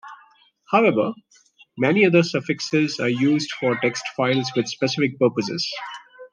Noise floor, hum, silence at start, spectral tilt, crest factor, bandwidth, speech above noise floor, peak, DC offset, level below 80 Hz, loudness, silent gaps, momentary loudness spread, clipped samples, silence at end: -55 dBFS; none; 0.05 s; -5.5 dB/octave; 18 dB; 10 kHz; 35 dB; -4 dBFS; under 0.1%; -70 dBFS; -21 LUFS; none; 10 LU; under 0.1%; 0.05 s